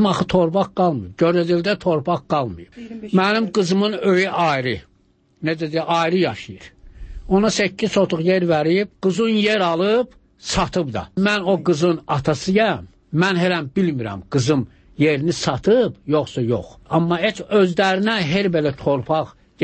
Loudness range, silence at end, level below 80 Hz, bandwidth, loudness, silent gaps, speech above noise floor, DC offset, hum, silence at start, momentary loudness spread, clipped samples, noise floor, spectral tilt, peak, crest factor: 2 LU; 0 s; -46 dBFS; 8.8 kHz; -19 LUFS; none; 40 dB; under 0.1%; none; 0 s; 8 LU; under 0.1%; -59 dBFS; -5.5 dB/octave; -4 dBFS; 14 dB